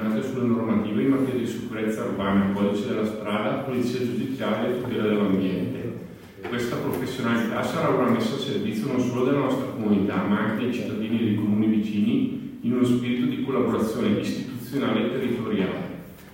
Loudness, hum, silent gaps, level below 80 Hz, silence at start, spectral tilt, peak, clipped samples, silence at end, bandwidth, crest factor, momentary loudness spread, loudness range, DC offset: -25 LUFS; none; none; -58 dBFS; 0 s; -7 dB/octave; -10 dBFS; under 0.1%; 0 s; 16.5 kHz; 16 dB; 7 LU; 2 LU; under 0.1%